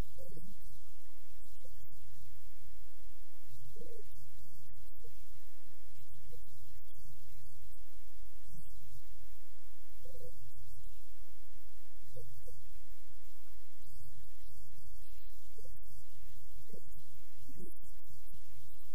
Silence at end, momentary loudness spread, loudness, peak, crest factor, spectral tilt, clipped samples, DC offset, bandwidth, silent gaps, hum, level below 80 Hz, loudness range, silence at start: 0 s; 6 LU; -60 LUFS; -24 dBFS; 16 dB; -5.5 dB/octave; under 0.1%; 6%; 15.5 kHz; none; none; -60 dBFS; 2 LU; 0 s